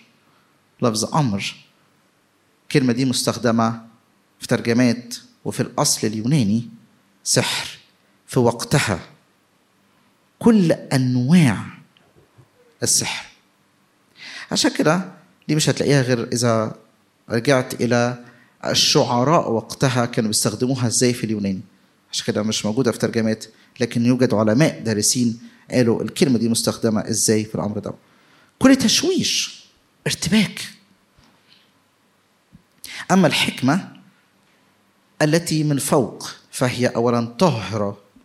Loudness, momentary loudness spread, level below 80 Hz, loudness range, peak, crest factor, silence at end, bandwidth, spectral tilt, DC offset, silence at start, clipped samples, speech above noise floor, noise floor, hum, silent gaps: -19 LUFS; 14 LU; -60 dBFS; 4 LU; 0 dBFS; 20 dB; 0.3 s; 16 kHz; -4.5 dB/octave; under 0.1%; 0.8 s; under 0.1%; 42 dB; -61 dBFS; none; none